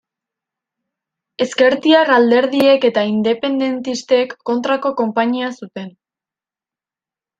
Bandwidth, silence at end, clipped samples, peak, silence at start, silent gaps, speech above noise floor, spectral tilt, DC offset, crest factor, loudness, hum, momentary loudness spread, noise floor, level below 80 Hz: 14.5 kHz; 1.5 s; under 0.1%; -2 dBFS; 1.4 s; none; 75 dB; -4.5 dB/octave; under 0.1%; 16 dB; -15 LUFS; none; 12 LU; -90 dBFS; -66 dBFS